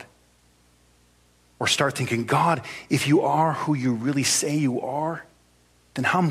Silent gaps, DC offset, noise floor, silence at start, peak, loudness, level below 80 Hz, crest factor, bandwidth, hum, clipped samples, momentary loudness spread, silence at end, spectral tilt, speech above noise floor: none; under 0.1%; -60 dBFS; 0 s; -6 dBFS; -23 LUFS; -64 dBFS; 18 dB; 15.5 kHz; 60 Hz at -55 dBFS; under 0.1%; 8 LU; 0 s; -4 dB/octave; 37 dB